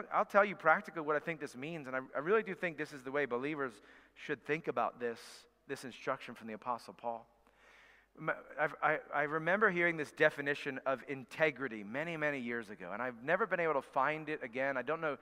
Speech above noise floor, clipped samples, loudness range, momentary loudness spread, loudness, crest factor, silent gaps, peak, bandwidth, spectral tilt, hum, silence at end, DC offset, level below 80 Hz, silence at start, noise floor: 28 dB; under 0.1%; 8 LU; 13 LU; -36 LUFS; 24 dB; none; -12 dBFS; 15.5 kHz; -5.5 dB/octave; none; 0.05 s; under 0.1%; -78 dBFS; 0 s; -64 dBFS